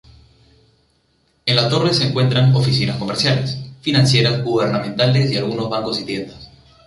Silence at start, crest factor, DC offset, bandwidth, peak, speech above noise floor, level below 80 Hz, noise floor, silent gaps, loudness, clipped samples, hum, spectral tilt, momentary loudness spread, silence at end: 1.45 s; 16 dB; under 0.1%; 11.5 kHz; -2 dBFS; 45 dB; -50 dBFS; -62 dBFS; none; -17 LUFS; under 0.1%; none; -5.5 dB/octave; 10 LU; 0.4 s